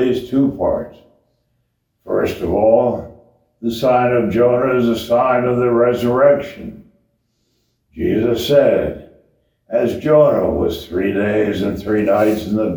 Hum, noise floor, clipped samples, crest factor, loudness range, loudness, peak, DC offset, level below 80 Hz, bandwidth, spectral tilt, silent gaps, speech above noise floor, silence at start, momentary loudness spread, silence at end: none; -67 dBFS; under 0.1%; 16 dB; 4 LU; -16 LUFS; 0 dBFS; under 0.1%; -42 dBFS; over 20 kHz; -7 dB/octave; none; 52 dB; 0 s; 11 LU; 0 s